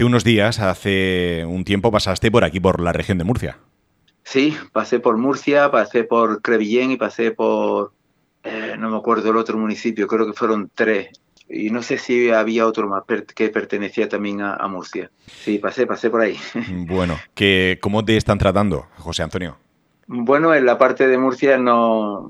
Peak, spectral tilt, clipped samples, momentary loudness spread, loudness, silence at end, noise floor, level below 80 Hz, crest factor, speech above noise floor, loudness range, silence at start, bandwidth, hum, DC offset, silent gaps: 0 dBFS; -6 dB/octave; under 0.1%; 11 LU; -18 LUFS; 0 s; -62 dBFS; -44 dBFS; 18 dB; 44 dB; 4 LU; 0 s; 13 kHz; none; under 0.1%; none